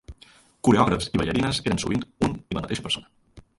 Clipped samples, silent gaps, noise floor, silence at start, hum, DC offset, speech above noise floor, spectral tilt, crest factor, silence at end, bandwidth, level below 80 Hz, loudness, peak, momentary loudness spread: under 0.1%; none; -54 dBFS; 0.1 s; none; under 0.1%; 31 dB; -5 dB/octave; 20 dB; 0.2 s; 11.5 kHz; -44 dBFS; -24 LUFS; -6 dBFS; 9 LU